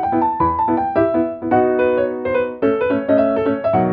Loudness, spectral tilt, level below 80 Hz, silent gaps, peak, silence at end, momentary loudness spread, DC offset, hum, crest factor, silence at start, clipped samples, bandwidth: -17 LUFS; -10.5 dB/octave; -46 dBFS; none; -4 dBFS; 0 s; 3 LU; under 0.1%; none; 14 dB; 0 s; under 0.1%; 5 kHz